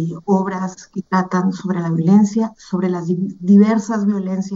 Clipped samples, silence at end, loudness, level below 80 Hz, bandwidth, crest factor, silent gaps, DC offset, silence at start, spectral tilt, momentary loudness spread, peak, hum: under 0.1%; 0 s; -17 LUFS; -62 dBFS; 7.6 kHz; 16 dB; none; under 0.1%; 0 s; -8 dB/octave; 10 LU; -2 dBFS; none